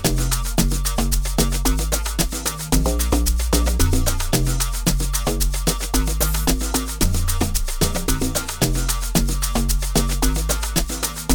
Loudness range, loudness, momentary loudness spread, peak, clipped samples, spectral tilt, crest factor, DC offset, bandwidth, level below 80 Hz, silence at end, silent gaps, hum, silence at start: 1 LU; -21 LUFS; 3 LU; -2 dBFS; under 0.1%; -4 dB/octave; 16 dB; 0.2%; over 20 kHz; -22 dBFS; 0 s; none; none; 0 s